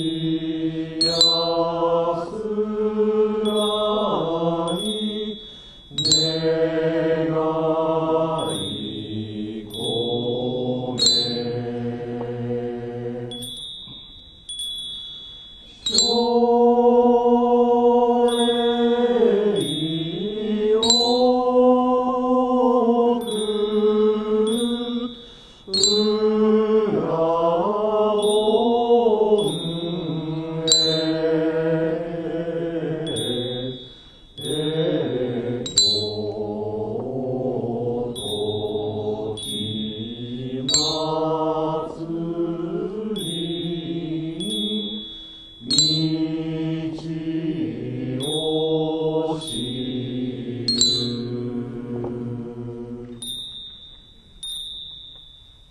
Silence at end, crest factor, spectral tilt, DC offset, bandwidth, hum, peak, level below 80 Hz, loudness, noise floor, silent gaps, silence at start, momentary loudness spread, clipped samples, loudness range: 0.4 s; 22 dB; -4 dB/octave; under 0.1%; 13 kHz; none; 0 dBFS; -52 dBFS; -21 LUFS; -47 dBFS; none; 0 s; 14 LU; under 0.1%; 8 LU